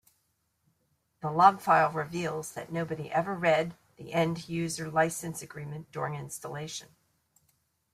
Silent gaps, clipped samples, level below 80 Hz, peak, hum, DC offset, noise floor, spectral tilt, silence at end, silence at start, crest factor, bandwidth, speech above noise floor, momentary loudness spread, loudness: none; under 0.1%; -68 dBFS; -6 dBFS; none; under 0.1%; -76 dBFS; -5 dB/octave; 1.1 s; 1.2 s; 24 dB; 15.5 kHz; 46 dB; 17 LU; -29 LUFS